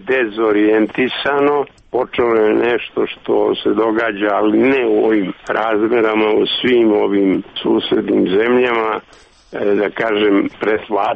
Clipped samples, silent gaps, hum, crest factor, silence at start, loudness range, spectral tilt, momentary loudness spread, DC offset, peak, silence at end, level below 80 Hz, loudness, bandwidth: under 0.1%; none; none; 10 dB; 0 s; 2 LU; -7 dB/octave; 6 LU; under 0.1%; -4 dBFS; 0 s; -52 dBFS; -15 LUFS; 6.2 kHz